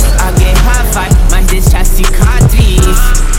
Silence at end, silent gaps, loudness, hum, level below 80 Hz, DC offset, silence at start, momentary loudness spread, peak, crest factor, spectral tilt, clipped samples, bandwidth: 0 s; none; -10 LUFS; none; -6 dBFS; under 0.1%; 0 s; 3 LU; 0 dBFS; 6 dB; -4.5 dB/octave; 0.5%; 17 kHz